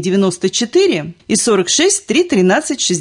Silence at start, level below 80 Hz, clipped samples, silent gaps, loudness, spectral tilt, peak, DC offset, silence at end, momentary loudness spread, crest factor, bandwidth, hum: 0 s; -56 dBFS; under 0.1%; none; -14 LUFS; -3.5 dB/octave; -2 dBFS; under 0.1%; 0 s; 4 LU; 12 dB; 11 kHz; none